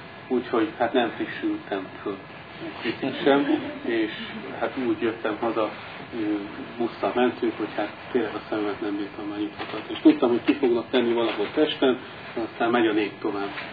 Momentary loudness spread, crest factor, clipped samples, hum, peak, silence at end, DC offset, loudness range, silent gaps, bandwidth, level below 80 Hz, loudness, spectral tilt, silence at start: 11 LU; 20 dB; under 0.1%; none; -4 dBFS; 0 s; under 0.1%; 4 LU; none; 5 kHz; -64 dBFS; -26 LUFS; -8 dB/octave; 0 s